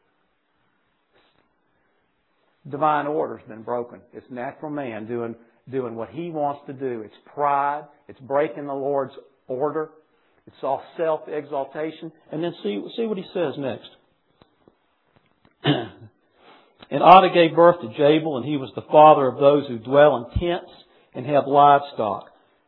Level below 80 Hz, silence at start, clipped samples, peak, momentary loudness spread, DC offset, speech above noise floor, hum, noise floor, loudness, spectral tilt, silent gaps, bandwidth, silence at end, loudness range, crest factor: -50 dBFS; 2.65 s; under 0.1%; 0 dBFS; 18 LU; under 0.1%; 48 dB; none; -69 dBFS; -21 LUFS; -9.5 dB/octave; none; 5.2 kHz; 0.5 s; 14 LU; 22 dB